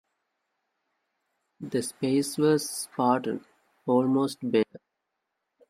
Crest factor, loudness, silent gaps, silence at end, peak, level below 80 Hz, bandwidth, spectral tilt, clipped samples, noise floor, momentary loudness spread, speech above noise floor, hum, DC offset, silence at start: 20 dB; -27 LUFS; none; 0.9 s; -8 dBFS; -74 dBFS; 15.5 kHz; -5 dB/octave; under 0.1%; -82 dBFS; 10 LU; 56 dB; none; under 0.1%; 1.6 s